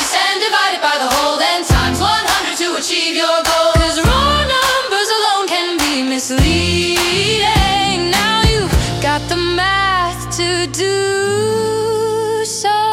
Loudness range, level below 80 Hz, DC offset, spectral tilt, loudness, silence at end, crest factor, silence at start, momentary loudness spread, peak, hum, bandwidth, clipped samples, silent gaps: 2 LU; -26 dBFS; under 0.1%; -3.5 dB/octave; -14 LUFS; 0 s; 14 dB; 0 s; 4 LU; 0 dBFS; none; 17.5 kHz; under 0.1%; none